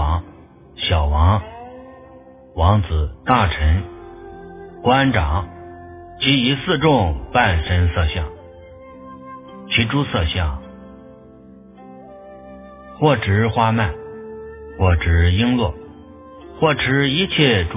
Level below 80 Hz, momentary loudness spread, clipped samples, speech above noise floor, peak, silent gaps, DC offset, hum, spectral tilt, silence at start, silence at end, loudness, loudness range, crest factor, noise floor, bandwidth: -26 dBFS; 23 LU; under 0.1%; 27 dB; 0 dBFS; none; under 0.1%; none; -10 dB/octave; 0 s; 0 s; -18 LUFS; 6 LU; 20 dB; -43 dBFS; 3.8 kHz